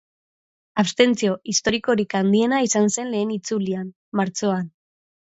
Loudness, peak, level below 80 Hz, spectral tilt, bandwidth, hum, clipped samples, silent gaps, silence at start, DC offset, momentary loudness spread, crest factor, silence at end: -21 LUFS; -2 dBFS; -60 dBFS; -4 dB/octave; 8.2 kHz; none; under 0.1%; 3.96-4.12 s; 0.75 s; under 0.1%; 9 LU; 20 dB; 0.65 s